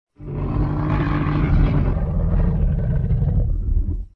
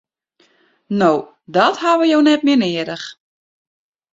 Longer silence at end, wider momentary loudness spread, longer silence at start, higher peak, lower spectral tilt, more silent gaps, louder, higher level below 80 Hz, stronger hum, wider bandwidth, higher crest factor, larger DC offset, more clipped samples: second, 0.05 s vs 1 s; second, 6 LU vs 12 LU; second, 0.2 s vs 0.9 s; second, -6 dBFS vs -2 dBFS; first, -10.5 dB/octave vs -5.5 dB/octave; neither; second, -21 LUFS vs -16 LUFS; first, -22 dBFS vs -64 dBFS; neither; second, 4.6 kHz vs 7.8 kHz; about the same, 14 dB vs 16 dB; neither; neither